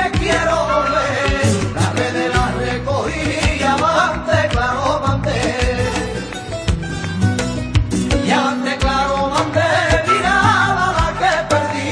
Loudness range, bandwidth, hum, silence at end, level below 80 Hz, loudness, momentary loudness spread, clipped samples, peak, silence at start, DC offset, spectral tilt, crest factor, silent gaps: 4 LU; 11 kHz; none; 0 s; -28 dBFS; -17 LUFS; 6 LU; under 0.1%; -2 dBFS; 0 s; under 0.1%; -5 dB/octave; 14 dB; none